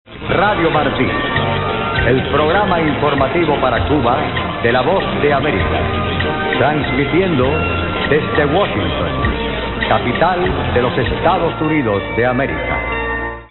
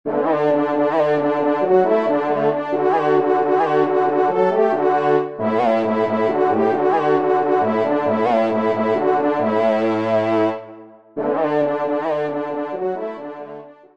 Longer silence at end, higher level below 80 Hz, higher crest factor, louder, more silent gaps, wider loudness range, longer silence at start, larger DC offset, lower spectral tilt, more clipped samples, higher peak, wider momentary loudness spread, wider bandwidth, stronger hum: second, 0.05 s vs 0.25 s; first, -30 dBFS vs -68 dBFS; about the same, 14 dB vs 14 dB; first, -15 LUFS vs -18 LUFS; neither; second, 1 LU vs 4 LU; about the same, 0.1 s vs 0.05 s; second, under 0.1% vs 0.3%; second, -4 dB/octave vs -7.5 dB/octave; neither; first, 0 dBFS vs -4 dBFS; second, 4 LU vs 7 LU; second, 4.2 kHz vs 7.4 kHz; neither